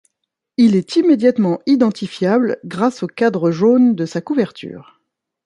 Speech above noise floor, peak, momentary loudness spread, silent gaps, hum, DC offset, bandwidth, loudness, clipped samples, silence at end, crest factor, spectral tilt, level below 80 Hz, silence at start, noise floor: 61 dB; -2 dBFS; 8 LU; none; none; under 0.1%; 10.5 kHz; -16 LUFS; under 0.1%; 0.65 s; 14 dB; -7 dB/octave; -64 dBFS; 0.6 s; -77 dBFS